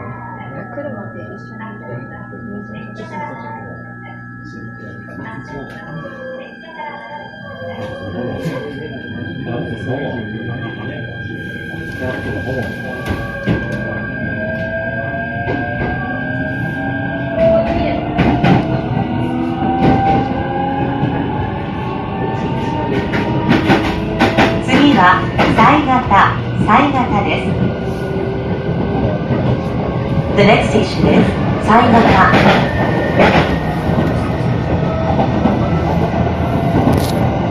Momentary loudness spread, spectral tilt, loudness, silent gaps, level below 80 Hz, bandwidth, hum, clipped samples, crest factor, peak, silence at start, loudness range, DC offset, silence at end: 18 LU; -7 dB/octave; -15 LUFS; none; -32 dBFS; 13.5 kHz; 60 Hz at -35 dBFS; under 0.1%; 16 dB; 0 dBFS; 0 s; 17 LU; under 0.1%; 0 s